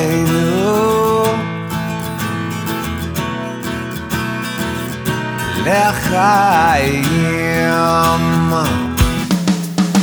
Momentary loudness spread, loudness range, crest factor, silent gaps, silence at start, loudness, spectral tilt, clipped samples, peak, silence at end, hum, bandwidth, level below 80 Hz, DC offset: 9 LU; 7 LU; 16 dB; none; 0 s; -16 LUFS; -5.5 dB/octave; under 0.1%; 0 dBFS; 0 s; none; over 20 kHz; -32 dBFS; under 0.1%